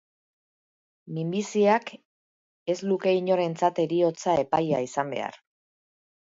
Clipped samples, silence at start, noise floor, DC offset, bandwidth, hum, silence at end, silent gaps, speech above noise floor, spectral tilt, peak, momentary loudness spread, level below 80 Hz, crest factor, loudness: under 0.1%; 1.05 s; under -90 dBFS; under 0.1%; 7.8 kHz; none; 0.85 s; 2.05-2.66 s; over 65 dB; -6 dB/octave; -8 dBFS; 11 LU; -70 dBFS; 18 dB; -26 LUFS